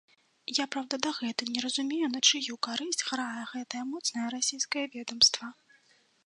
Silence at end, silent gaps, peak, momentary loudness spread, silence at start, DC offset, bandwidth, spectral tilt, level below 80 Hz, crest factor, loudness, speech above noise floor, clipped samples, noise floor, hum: 0.75 s; none; -8 dBFS; 14 LU; 0.5 s; under 0.1%; 11.5 kHz; 0 dB/octave; -76 dBFS; 24 dB; -29 LUFS; 35 dB; under 0.1%; -66 dBFS; none